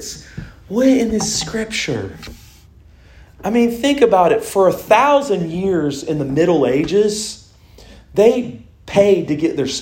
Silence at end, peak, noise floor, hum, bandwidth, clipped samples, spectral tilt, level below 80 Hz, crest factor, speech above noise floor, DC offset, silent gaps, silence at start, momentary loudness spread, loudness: 0 s; 0 dBFS; -45 dBFS; none; 16.5 kHz; under 0.1%; -5 dB/octave; -44 dBFS; 16 dB; 29 dB; under 0.1%; none; 0 s; 17 LU; -16 LUFS